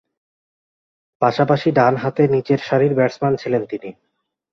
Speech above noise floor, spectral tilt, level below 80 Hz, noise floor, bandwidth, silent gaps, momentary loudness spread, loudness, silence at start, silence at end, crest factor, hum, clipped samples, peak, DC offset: over 73 dB; -8 dB/octave; -60 dBFS; under -90 dBFS; 7 kHz; none; 7 LU; -18 LUFS; 1.2 s; 0.6 s; 18 dB; none; under 0.1%; -2 dBFS; under 0.1%